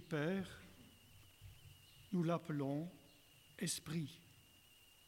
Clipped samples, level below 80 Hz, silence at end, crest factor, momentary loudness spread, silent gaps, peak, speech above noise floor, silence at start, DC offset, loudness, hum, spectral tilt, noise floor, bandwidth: under 0.1%; -74 dBFS; 0.65 s; 18 dB; 24 LU; none; -26 dBFS; 25 dB; 0 s; under 0.1%; -43 LUFS; none; -5 dB/octave; -67 dBFS; 17 kHz